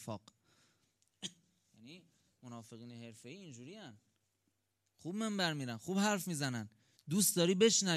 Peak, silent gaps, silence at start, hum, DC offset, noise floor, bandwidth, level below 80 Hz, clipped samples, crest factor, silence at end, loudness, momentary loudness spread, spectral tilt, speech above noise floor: -16 dBFS; none; 0 s; none; under 0.1%; -83 dBFS; 15.5 kHz; -82 dBFS; under 0.1%; 22 dB; 0 s; -34 LUFS; 23 LU; -3.5 dB/octave; 47 dB